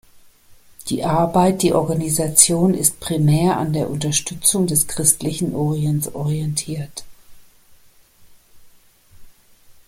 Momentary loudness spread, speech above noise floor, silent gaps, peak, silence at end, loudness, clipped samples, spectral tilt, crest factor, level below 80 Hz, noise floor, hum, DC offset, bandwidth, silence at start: 10 LU; 31 dB; none; 0 dBFS; 0.15 s; -18 LUFS; under 0.1%; -4.5 dB/octave; 20 dB; -48 dBFS; -50 dBFS; none; under 0.1%; 16.5 kHz; 0.5 s